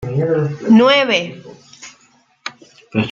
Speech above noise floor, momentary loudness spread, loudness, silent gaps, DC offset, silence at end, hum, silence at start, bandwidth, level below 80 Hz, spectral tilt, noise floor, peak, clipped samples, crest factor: 41 dB; 21 LU; -14 LUFS; none; under 0.1%; 0 s; none; 0 s; 7.4 kHz; -54 dBFS; -6 dB/octave; -54 dBFS; 0 dBFS; under 0.1%; 16 dB